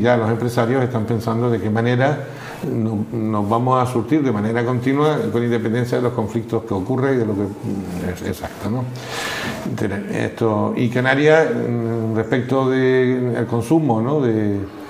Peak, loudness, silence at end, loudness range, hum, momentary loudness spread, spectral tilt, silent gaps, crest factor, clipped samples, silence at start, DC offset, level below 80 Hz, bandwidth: 0 dBFS; -19 LUFS; 0 s; 5 LU; none; 9 LU; -7 dB/octave; none; 18 dB; under 0.1%; 0 s; under 0.1%; -52 dBFS; 15.5 kHz